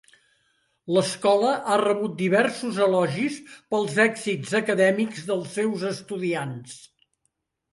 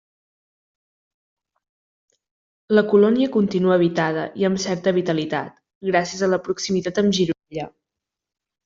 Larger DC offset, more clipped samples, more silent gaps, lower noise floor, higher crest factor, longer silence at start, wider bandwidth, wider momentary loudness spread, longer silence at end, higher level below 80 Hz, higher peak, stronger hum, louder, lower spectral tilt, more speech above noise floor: neither; neither; second, none vs 5.75-5.81 s; second, -75 dBFS vs -85 dBFS; about the same, 18 dB vs 18 dB; second, 0.85 s vs 2.7 s; first, 11.5 kHz vs 7.8 kHz; second, 9 LU vs 12 LU; about the same, 0.95 s vs 1 s; second, -72 dBFS vs -62 dBFS; about the same, -6 dBFS vs -4 dBFS; neither; second, -24 LUFS vs -20 LUFS; about the same, -5 dB/octave vs -5.5 dB/octave; second, 52 dB vs 66 dB